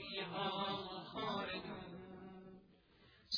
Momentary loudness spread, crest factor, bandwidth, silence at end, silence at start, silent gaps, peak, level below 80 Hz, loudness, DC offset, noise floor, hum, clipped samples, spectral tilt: 17 LU; 20 dB; 5.4 kHz; 0 s; 0 s; none; -26 dBFS; -72 dBFS; -44 LUFS; under 0.1%; -68 dBFS; none; under 0.1%; -2 dB/octave